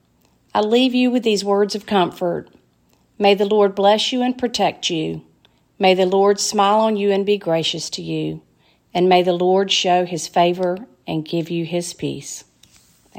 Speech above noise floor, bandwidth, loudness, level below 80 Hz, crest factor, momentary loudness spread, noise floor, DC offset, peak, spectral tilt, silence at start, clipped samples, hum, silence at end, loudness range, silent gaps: 41 dB; 16 kHz; -18 LUFS; -62 dBFS; 18 dB; 12 LU; -59 dBFS; under 0.1%; -2 dBFS; -4.5 dB/octave; 0.55 s; under 0.1%; none; 0 s; 2 LU; none